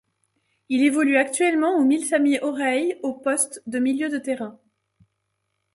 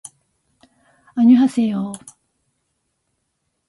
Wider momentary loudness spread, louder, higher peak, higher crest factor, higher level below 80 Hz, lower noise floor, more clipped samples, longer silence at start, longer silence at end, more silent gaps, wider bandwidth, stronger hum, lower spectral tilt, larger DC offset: second, 8 LU vs 17 LU; second, -22 LUFS vs -17 LUFS; about the same, -6 dBFS vs -4 dBFS; about the same, 18 dB vs 18 dB; about the same, -72 dBFS vs -68 dBFS; first, -76 dBFS vs -72 dBFS; neither; second, 0.7 s vs 1.15 s; second, 1.2 s vs 1.7 s; neither; about the same, 11.5 kHz vs 11.5 kHz; neither; second, -2.5 dB/octave vs -6.5 dB/octave; neither